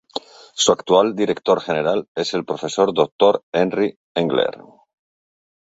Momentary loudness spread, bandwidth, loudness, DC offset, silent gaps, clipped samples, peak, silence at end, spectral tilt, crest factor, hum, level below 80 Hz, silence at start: 8 LU; 8 kHz; -19 LUFS; under 0.1%; 2.08-2.15 s, 3.12-3.19 s, 3.43-3.52 s, 3.96-4.15 s; under 0.1%; -2 dBFS; 1.1 s; -4 dB/octave; 18 dB; none; -62 dBFS; 0.15 s